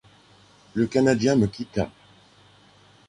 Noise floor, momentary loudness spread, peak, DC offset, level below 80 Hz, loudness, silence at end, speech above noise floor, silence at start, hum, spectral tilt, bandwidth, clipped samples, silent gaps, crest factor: -55 dBFS; 12 LU; -6 dBFS; under 0.1%; -52 dBFS; -23 LUFS; 1.2 s; 33 dB; 0.75 s; none; -6.5 dB/octave; 11 kHz; under 0.1%; none; 20 dB